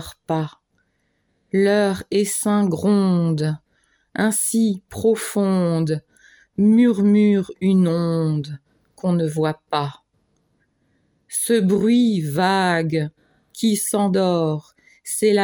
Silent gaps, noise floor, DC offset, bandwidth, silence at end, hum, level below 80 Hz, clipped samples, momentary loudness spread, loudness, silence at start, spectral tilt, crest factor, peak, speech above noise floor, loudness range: none; -68 dBFS; under 0.1%; over 20 kHz; 0 s; none; -58 dBFS; under 0.1%; 11 LU; -20 LUFS; 0 s; -5.5 dB/octave; 14 dB; -6 dBFS; 49 dB; 4 LU